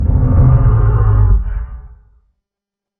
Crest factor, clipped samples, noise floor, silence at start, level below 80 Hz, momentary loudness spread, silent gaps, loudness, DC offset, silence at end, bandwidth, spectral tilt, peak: 12 dB; under 0.1%; -85 dBFS; 0 s; -16 dBFS; 15 LU; none; -12 LUFS; under 0.1%; 1.1 s; 2.3 kHz; -13 dB/octave; 0 dBFS